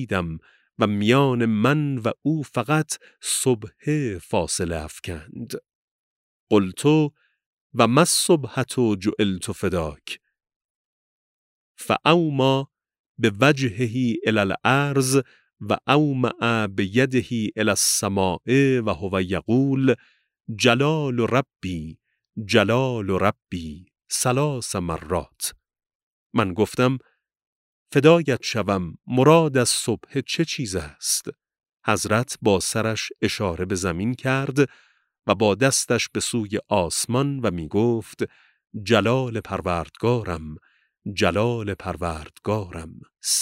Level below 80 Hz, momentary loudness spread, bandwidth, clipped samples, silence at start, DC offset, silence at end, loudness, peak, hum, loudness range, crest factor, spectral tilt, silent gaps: -50 dBFS; 13 LU; 16 kHz; under 0.1%; 0 s; under 0.1%; 0 s; -22 LUFS; -2 dBFS; none; 5 LU; 20 dB; -4.5 dB/octave; 5.75-6.47 s, 7.46-7.70 s, 10.56-11.75 s, 12.99-13.15 s, 25.95-26.30 s, 27.47-27.86 s